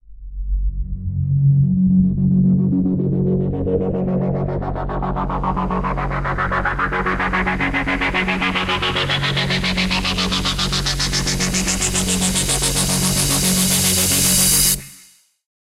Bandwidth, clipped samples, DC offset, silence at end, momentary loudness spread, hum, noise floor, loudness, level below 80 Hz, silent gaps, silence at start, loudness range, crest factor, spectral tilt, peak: 16 kHz; under 0.1%; under 0.1%; 0.6 s; 9 LU; none; -50 dBFS; -18 LUFS; -30 dBFS; none; 0.1 s; 6 LU; 16 dB; -3.5 dB/octave; -2 dBFS